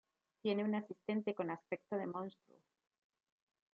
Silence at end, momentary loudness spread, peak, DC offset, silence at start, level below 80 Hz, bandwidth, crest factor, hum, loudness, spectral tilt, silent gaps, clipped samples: 1.45 s; 7 LU; -24 dBFS; under 0.1%; 0.45 s; under -90 dBFS; 5.4 kHz; 18 dB; none; -41 LUFS; -5.5 dB/octave; none; under 0.1%